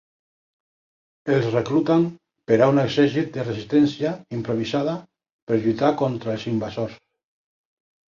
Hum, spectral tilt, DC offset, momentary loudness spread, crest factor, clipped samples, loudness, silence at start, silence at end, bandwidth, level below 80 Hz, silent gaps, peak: none; -7.5 dB/octave; under 0.1%; 11 LU; 18 dB; under 0.1%; -22 LUFS; 1.25 s; 1.2 s; 7.4 kHz; -58 dBFS; 5.32-5.47 s; -4 dBFS